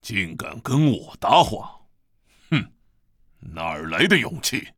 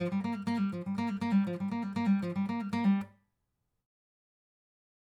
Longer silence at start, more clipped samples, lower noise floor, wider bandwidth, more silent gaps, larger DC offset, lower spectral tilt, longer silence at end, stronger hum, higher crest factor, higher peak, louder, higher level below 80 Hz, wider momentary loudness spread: about the same, 0.05 s vs 0 s; neither; second, -61 dBFS vs -82 dBFS; first, 18.5 kHz vs 9.2 kHz; neither; neither; second, -4.5 dB/octave vs -8 dB/octave; second, 0.1 s vs 2 s; neither; first, 22 dB vs 14 dB; first, -2 dBFS vs -18 dBFS; first, -21 LUFS vs -32 LUFS; first, -50 dBFS vs -74 dBFS; first, 16 LU vs 5 LU